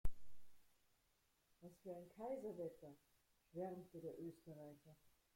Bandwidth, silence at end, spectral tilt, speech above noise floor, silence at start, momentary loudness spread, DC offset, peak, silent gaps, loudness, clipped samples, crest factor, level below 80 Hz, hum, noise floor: 16.5 kHz; 0.4 s; -8 dB/octave; 29 dB; 0.05 s; 14 LU; under 0.1%; -28 dBFS; none; -54 LUFS; under 0.1%; 22 dB; -60 dBFS; none; -82 dBFS